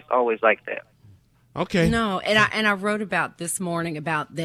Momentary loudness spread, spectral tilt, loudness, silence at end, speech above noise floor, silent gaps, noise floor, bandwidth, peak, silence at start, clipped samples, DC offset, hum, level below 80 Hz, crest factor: 10 LU; -4.5 dB/octave; -22 LUFS; 0 s; 31 dB; none; -54 dBFS; 14.5 kHz; -6 dBFS; 0.1 s; under 0.1%; under 0.1%; none; -48 dBFS; 18 dB